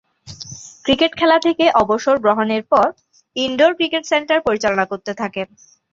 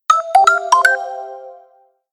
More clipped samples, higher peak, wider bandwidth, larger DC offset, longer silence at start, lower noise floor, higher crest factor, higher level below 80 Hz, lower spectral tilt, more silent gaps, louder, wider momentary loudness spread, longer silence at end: neither; about the same, -2 dBFS vs 0 dBFS; second, 7.8 kHz vs 15 kHz; neither; first, 0.25 s vs 0.1 s; second, -36 dBFS vs -53 dBFS; about the same, 16 dB vs 16 dB; first, -52 dBFS vs -70 dBFS; first, -4 dB/octave vs 1.5 dB/octave; neither; second, -17 LUFS vs -13 LUFS; second, 15 LU vs 18 LU; about the same, 0.5 s vs 0.6 s